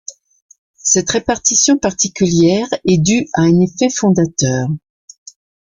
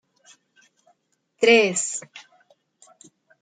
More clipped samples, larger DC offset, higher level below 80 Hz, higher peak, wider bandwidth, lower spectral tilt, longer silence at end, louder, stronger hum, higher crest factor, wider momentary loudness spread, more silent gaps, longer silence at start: neither; neither; first, -46 dBFS vs -80 dBFS; first, 0 dBFS vs -4 dBFS; about the same, 10 kHz vs 9.6 kHz; first, -4.5 dB/octave vs -2 dB/octave; second, 0.9 s vs 1.25 s; first, -14 LUFS vs -19 LUFS; neither; about the same, 16 dB vs 20 dB; second, 7 LU vs 18 LU; first, 0.42-0.49 s, 0.58-0.74 s vs none; second, 0.1 s vs 1.4 s